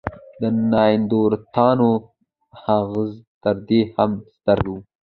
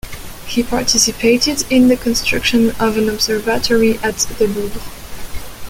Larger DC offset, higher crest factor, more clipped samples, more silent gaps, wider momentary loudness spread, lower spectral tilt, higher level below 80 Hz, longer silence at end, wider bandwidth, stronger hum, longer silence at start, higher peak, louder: neither; about the same, 18 dB vs 16 dB; neither; first, 3.27-3.41 s vs none; second, 10 LU vs 19 LU; first, -10.5 dB/octave vs -3 dB/octave; second, -46 dBFS vs -34 dBFS; first, 0.2 s vs 0 s; second, 4.6 kHz vs 17 kHz; neither; about the same, 0.05 s vs 0.05 s; about the same, -2 dBFS vs 0 dBFS; second, -20 LUFS vs -15 LUFS